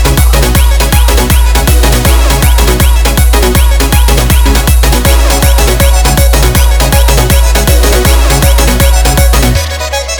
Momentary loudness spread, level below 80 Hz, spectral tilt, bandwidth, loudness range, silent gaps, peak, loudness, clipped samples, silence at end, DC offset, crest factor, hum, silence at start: 1 LU; -6 dBFS; -4 dB/octave; over 20 kHz; 0 LU; none; 0 dBFS; -7 LUFS; 2%; 0 s; 0.2%; 6 dB; none; 0 s